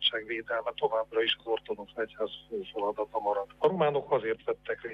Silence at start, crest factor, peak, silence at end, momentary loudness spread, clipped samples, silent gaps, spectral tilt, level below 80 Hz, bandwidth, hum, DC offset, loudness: 0 s; 18 dB; -14 dBFS; 0 s; 9 LU; under 0.1%; none; -6 dB/octave; -66 dBFS; 5.4 kHz; 50 Hz at -65 dBFS; under 0.1%; -31 LUFS